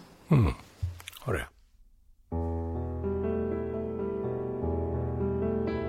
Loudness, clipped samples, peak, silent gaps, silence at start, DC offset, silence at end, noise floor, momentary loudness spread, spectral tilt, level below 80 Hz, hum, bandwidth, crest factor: -32 LUFS; under 0.1%; -12 dBFS; none; 0 s; under 0.1%; 0 s; -58 dBFS; 12 LU; -8.5 dB/octave; -42 dBFS; none; 15.5 kHz; 18 dB